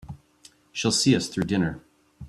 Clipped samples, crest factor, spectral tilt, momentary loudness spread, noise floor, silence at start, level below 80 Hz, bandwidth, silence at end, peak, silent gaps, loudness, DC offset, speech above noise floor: under 0.1%; 20 dB; -4 dB/octave; 23 LU; -56 dBFS; 0.05 s; -54 dBFS; 13.5 kHz; 0 s; -8 dBFS; none; -24 LUFS; under 0.1%; 33 dB